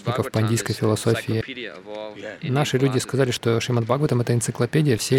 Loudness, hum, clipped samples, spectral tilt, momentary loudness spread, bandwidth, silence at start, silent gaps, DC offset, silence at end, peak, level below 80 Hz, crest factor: -22 LUFS; none; under 0.1%; -5.5 dB/octave; 13 LU; 16.5 kHz; 0 s; none; under 0.1%; 0 s; -6 dBFS; -56 dBFS; 16 dB